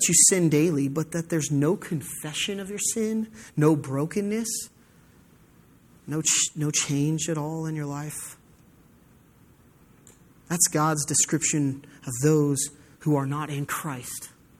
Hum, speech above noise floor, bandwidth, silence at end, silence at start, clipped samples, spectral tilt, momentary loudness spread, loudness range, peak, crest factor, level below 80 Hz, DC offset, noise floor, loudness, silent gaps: none; 31 dB; 16 kHz; 0.3 s; 0 s; under 0.1%; -4 dB/octave; 12 LU; 6 LU; -6 dBFS; 20 dB; -62 dBFS; under 0.1%; -56 dBFS; -25 LUFS; none